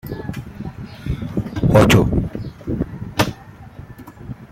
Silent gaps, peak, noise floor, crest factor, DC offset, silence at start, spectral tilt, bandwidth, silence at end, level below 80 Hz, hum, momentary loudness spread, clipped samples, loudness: none; 0 dBFS; -38 dBFS; 20 dB; under 0.1%; 0.05 s; -6 dB/octave; 16 kHz; 0.05 s; -34 dBFS; none; 25 LU; under 0.1%; -19 LUFS